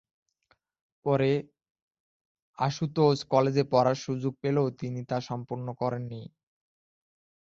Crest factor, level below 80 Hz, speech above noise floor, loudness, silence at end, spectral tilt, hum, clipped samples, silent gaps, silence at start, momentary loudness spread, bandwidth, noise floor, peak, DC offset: 20 dB; -66 dBFS; 44 dB; -28 LUFS; 1.3 s; -7 dB/octave; none; under 0.1%; 1.71-1.75 s, 1.82-1.91 s, 2.00-2.35 s, 2.42-2.54 s; 1.05 s; 12 LU; 7.6 kHz; -71 dBFS; -8 dBFS; under 0.1%